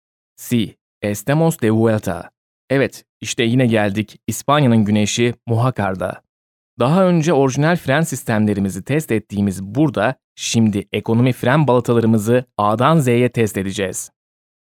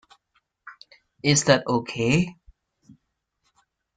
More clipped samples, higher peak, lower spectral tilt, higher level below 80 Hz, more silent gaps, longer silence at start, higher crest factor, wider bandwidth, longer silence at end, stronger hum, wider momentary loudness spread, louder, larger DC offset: neither; first, 0 dBFS vs -4 dBFS; first, -6 dB/octave vs -4 dB/octave; about the same, -56 dBFS vs -58 dBFS; first, 0.81-1.01 s, 2.37-2.68 s, 3.09-3.21 s, 6.29-6.77 s, 10.24-10.36 s vs none; second, 0.4 s vs 0.65 s; second, 16 dB vs 24 dB; first, 17.5 kHz vs 9.6 kHz; second, 0.6 s vs 1.65 s; neither; about the same, 10 LU vs 11 LU; first, -17 LUFS vs -22 LUFS; neither